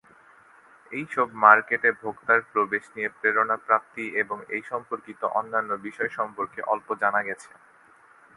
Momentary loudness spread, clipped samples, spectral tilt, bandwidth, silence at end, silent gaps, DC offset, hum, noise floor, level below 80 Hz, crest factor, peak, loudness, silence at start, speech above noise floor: 13 LU; under 0.1%; -5.5 dB/octave; 11.5 kHz; 0.95 s; none; under 0.1%; none; -55 dBFS; -74 dBFS; 26 dB; 0 dBFS; -24 LUFS; 0.9 s; 30 dB